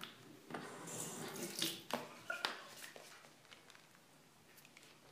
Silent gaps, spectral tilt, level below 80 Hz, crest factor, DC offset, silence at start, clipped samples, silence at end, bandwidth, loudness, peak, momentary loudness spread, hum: none; -2 dB/octave; under -90 dBFS; 34 dB; under 0.1%; 0 s; under 0.1%; 0 s; 15.5 kHz; -45 LUFS; -16 dBFS; 22 LU; none